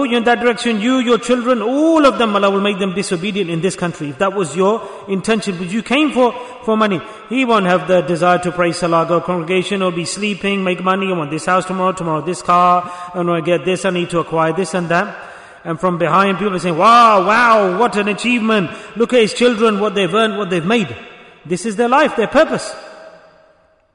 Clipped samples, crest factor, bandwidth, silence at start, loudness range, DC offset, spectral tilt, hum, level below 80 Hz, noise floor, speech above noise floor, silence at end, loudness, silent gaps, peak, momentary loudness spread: under 0.1%; 14 dB; 11 kHz; 0 s; 5 LU; under 0.1%; -5 dB/octave; none; -52 dBFS; -53 dBFS; 38 dB; 0.85 s; -15 LUFS; none; 0 dBFS; 10 LU